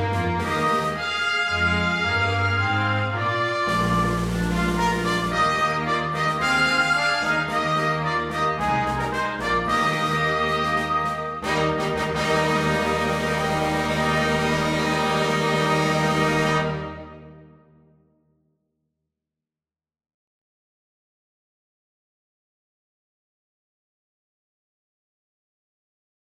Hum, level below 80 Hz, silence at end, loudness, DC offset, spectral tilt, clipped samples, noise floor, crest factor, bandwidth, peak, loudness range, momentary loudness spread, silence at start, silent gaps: none; -44 dBFS; 8.8 s; -22 LUFS; under 0.1%; -5 dB/octave; under 0.1%; under -90 dBFS; 16 dB; 16 kHz; -8 dBFS; 2 LU; 4 LU; 0 s; none